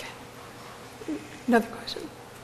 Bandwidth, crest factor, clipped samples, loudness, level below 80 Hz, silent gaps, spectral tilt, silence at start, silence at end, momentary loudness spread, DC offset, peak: 14.5 kHz; 24 dB; under 0.1%; -30 LUFS; -62 dBFS; none; -4.5 dB/octave; 0 s; 0 s; 18 LU; under 0.1%; -8 dBFS